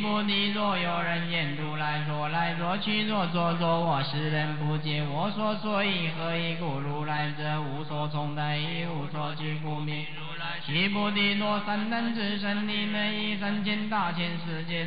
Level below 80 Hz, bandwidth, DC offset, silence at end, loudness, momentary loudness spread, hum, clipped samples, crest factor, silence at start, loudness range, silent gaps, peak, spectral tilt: -70 dBFS; 5.2 kHz; 1%; 0 s; -29 LUFS; 7 LU; none; under 0.1%; 14 dB; 0 s; 4 LU; none; -16 dBFS; -10 dB/octave